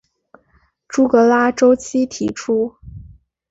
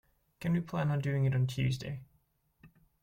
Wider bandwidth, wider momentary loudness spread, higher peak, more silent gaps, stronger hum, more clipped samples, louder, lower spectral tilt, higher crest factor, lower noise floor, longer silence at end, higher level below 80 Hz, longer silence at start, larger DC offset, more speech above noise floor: second, 8 kHz vs 15.5 kHz; about the same, 11 LU vs 10 LU; first, -2 dBFS vs -20 dBFS; neither; neither; neither; first, -16 LUFS vs -33 LUFS; second, -5 dB/octave vs -7.5 dB/octave; about the same, 16 dB vs 14 dB; second, -59 dBFS vs -73 dBFS; first, 0.5 s vs 0.35 s; first, -48 dBFS vs -62 dBFS; first, 0.9 s vs 0.4 s; neither; about the same, 44 dB vs 41 dB